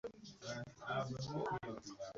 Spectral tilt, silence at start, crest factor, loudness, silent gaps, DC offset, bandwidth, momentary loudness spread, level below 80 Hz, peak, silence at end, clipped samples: -4.5 dB/octave; 0.05 s; 16 dB; -45 LUFS; none; under 0.1%; 7.6 kHz; 8 LU; -70 dBFS; -30 dBFS; 0 s; under 0.1%